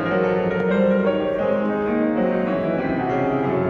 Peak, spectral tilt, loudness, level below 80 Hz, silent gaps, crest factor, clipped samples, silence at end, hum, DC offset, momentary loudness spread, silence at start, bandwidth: -8 dBFS; -9 dB/octave; -21 LUFS; -48 dBFS; none; 12 dB; under 0.1%; 0 s; none; under 0.1%; 4 LU; 0 s; 6.4 kHz